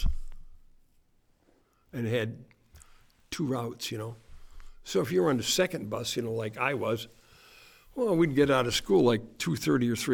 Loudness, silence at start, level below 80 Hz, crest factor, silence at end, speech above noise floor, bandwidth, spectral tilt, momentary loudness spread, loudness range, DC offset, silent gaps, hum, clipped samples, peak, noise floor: -29 LUFS; 0 s; -44 dBFS; 18 dB; 0 s; 38 dB; over 20 kHz; -5 dB/octave; 17 LU; 9 LU; under 0.1%; none; none; under 0.1%; -12 dBFS; -66 dBFS